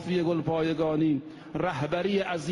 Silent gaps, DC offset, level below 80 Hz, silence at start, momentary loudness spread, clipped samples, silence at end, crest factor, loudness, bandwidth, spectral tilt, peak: none; under 0.1%; -58 dBFS; 0 s; 6 LU; under 0.1%; 0 s; 14 dB; -28 LUFS; 11 kHz; -7 dB/octave; -14 dBFS